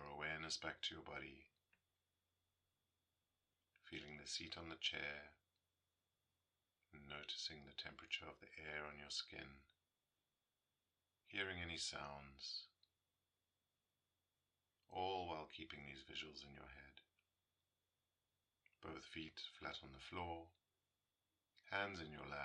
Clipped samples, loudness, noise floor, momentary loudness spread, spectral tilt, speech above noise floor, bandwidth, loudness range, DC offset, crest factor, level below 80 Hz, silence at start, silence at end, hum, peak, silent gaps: under 0.1%; -50 LUFS; under -90 dBFS; 15 LU; -2.5 dB/octave; over 38 dB; 9.6 kHz; 6 LU; under 0.1%; 26 dB; -76 dBFS; 0 s; 0 s; none; -28 dBFS; none